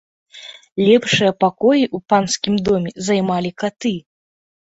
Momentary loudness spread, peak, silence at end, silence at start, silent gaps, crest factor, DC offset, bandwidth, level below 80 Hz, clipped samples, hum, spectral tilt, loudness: 15 LU; -2 dBFS; 0.8 s; 0.35 s; 0.72-0.76 s; 16 dB; under 0.1%; 8.2 kHz; -54 dBFS; under 0.1%; none; -4.5 dB/octave; -17 LUFS